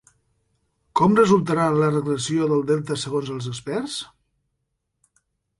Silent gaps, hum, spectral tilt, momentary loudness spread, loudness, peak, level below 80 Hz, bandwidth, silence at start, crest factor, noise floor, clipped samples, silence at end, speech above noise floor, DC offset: none; none; -6 dB/octave; 13 LU; -21 LUFS; -4 dBFS; -58 dBFS; 11.5 kHz; 0.95 s; 18 dB; -76 dBFS; under 0.1%; 1.55 s; 56 dB; under 0.1%